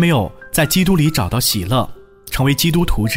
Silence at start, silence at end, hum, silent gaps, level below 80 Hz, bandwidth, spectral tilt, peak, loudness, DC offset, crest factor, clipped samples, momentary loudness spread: 0 s; 0 s; none; none; -28 dBFS; 16.5 kHz; -4.5 dB/octave; -4 dBFS; -16 LUFS; under 0.1%; 12 dB; under 0.1%; 6 LU